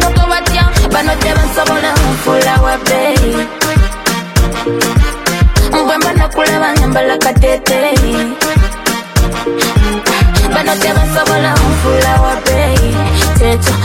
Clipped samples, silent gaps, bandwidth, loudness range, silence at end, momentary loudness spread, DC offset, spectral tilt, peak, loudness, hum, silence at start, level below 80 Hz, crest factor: under 0.1%; none; 16.5 kHz; 1 LU; 0 s; 4 LU; under 0.1%; -4.5 dB/octave; 0 dBFS; -11 LUFS; none; 0 s; -16 dBFS; 10 dB